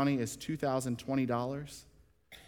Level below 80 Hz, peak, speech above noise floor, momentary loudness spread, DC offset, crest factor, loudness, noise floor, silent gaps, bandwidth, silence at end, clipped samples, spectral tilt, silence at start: -64 dBFS; -18 dBFS; 25 dB; 12 LU; under 0.1%; 16 dB; -34 LUFS; -59 dBFS; none; 17.5 kHz; 0.05 s; under 0.1%; -6 dB/octave; 0 s